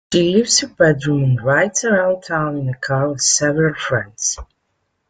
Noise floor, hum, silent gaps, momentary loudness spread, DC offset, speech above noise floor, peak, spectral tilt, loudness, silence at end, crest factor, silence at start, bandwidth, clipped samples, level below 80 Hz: -69 dBFS; none; none; 7 LU; under 0.1%; 53 dB; -2 dBFS; -4 dB/octave; -17 LUFS; 0.65 s; 16 dB; 0.1 s; 9.6 kHz; under 0.1%; -48 dBFS